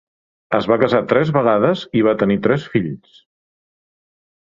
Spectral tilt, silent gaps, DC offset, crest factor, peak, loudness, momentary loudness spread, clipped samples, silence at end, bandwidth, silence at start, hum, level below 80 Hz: -8 dB/octave; none; under 0.1%; 18 dB; 0 dBFS; -17 LUFS; 7 LU; under 0.1%; 1.45 s; 7.6 kHz; 0.5 s; none; -54 dBFS